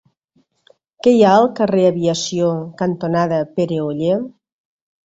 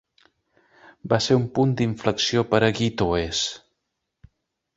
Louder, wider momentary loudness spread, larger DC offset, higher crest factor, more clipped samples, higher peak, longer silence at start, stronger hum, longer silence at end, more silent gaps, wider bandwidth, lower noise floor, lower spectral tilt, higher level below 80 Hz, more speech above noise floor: first, -17 LUFS vs -22 LUFS; first, 9 LU vs 6 LU; neither; second, 16 dB vs 22 dB; neither; about the same, -2 dBFS vs -4 dBFS; about the same, 1.05 s vs 1.05 s; neither; second, 0.75 s vs 1.2 s; neither; about the same, 8 kHz vs 8 kHz; second, -62 dBFS vs -79 dBFS; about the same, -6 dB/octave vs -5 dB/octave; second, -60 dBFS vs -48 dBFS; second, 46 dB vs 57 dB